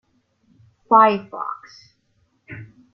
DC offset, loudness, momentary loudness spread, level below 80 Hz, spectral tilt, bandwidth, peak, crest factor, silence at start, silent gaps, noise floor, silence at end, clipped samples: under 0.1%; -18 LUFS; 25 LU; -68 dBFS; -7 dB/octave; 6.2 kHz; -2 dBFS; 20 dB; 0.9 s; none; -65 dBFS; 0.3 s; under 0.1%